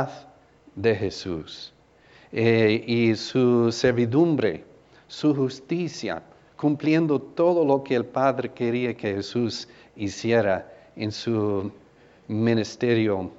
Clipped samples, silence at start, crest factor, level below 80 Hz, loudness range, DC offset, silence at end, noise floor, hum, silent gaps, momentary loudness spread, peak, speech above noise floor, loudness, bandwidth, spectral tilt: under 0.1%; 0 s; 18 dB; -60 dBFS; 4 LU; under 0.1%; 0.05 s; -55 dBFS; none; none; 13 LU; -6 dBFS; 31 dB; -24 LUFS; 8 kHz; -6.5 dB/octave